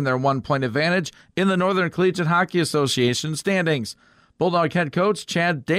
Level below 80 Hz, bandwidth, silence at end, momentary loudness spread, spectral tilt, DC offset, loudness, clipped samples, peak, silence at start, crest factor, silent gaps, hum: -58 dBFS; 15.5 kHz; 0 s; 4 LU; -5 dB/octave; under 0.1%; -21 LUFS; under 0.1%; -8 dBFS; 0 s; 12 dB; none; none